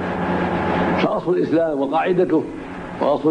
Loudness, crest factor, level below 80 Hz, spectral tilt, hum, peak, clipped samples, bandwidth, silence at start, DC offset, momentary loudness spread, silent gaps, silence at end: -20 LUFS; 14 dB; -46 dBFS; -8 dB/octave; none; -6 dBFS; under 0.1%; 9.8 kHz; 0 s; under 0.1%; 6 LU; none; 0 s